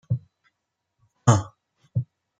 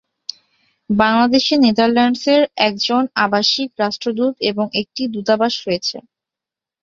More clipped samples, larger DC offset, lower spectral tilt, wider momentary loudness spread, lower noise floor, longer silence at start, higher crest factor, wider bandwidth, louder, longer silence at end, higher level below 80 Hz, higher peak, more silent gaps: neither; neither; first, -6 dB/octave vs -4.5 dB/octave; first, 18 LU vs 9 LU; second, -80 dBFS vs -87 dBFS; second, 0.1 s vs 0.9 s; first, 24 dB vs 18 dB; first, 9.4 kHz vs 7.6 kHz; second, -25 LUFS vs -16 LUFS; second, 0.35 s vs 0.8 s; about the same, -58 dBFS vs -56 dBFS; about the same, -2 dBFS vs 0 dBFS; neither